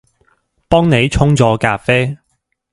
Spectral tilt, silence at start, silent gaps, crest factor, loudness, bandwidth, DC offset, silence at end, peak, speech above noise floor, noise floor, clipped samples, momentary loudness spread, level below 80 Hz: -6 dB/octave; 0.7 s; none; 14 dB; -13 LUFS; 11.5 kHz; under 0.1%; 0.6 s; 0 dBFS; 55 dB; -67 dBFS; under 0.1%; 6 LU; -32 dBFS